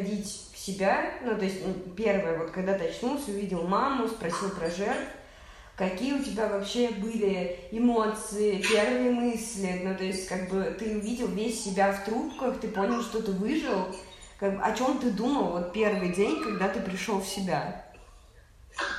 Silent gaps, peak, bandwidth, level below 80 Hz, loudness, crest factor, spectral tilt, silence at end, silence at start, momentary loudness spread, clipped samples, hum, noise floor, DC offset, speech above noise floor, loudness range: none; -12 dBFS; 14.5 kHz; -54 dBFS; -29 LUFS; 18 dB; -5 dB/octave; 0 s; 0 s; 7 LU; under 0.1%; none; -54 dBFS; under 0.1%; 25 dB; 3 LU